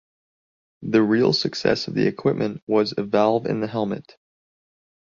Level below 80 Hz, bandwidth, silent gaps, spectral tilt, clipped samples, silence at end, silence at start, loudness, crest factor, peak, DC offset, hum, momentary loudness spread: -60 dBFS; 7.4 kHz; 2.62-2.67 s; -6 dB/octave; under 0.1%; 1.05 s; 0.8 s; -22 LUFS; 20 dB; -4 dBFS; under 0.1%; none; 8 LU